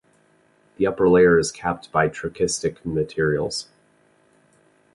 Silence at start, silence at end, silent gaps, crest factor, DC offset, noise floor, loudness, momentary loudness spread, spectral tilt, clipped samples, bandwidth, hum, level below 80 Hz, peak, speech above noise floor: 0.8 s; 1.3 s; none; 18 dB; under 0.1%; -60 dBFS; -21 LUFS; 11 LU; -5 dB/octave; under 0.1%; 11.5 kHz; none; -50 dBFS; -4 dBFS; 39 dB